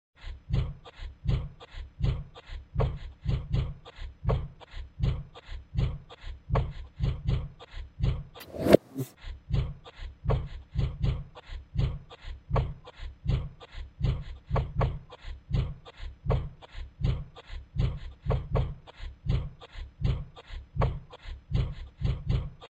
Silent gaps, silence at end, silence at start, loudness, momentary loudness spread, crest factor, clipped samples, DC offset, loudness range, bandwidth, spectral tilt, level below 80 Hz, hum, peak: none; 0.1 s; 0.2 s; -33 LUFS; 15 LU; 32 dB; under 0.1%; under 0.1%; 5 LU; 9.4 kHz; -8 dB/octave; -36 dBFS; none; 0 dBFS